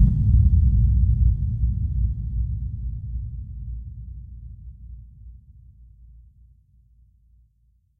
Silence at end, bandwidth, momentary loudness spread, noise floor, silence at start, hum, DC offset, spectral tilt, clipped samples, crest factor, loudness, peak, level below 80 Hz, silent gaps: 2.65 s; 0.5 kHz; 24 LU; -63 dBFS; 0 s; none; under 0.1%; -13 dB/octave; under 0.1%; 18 dB; -23 LUFS; -6 dBFS; -26 dBFS; none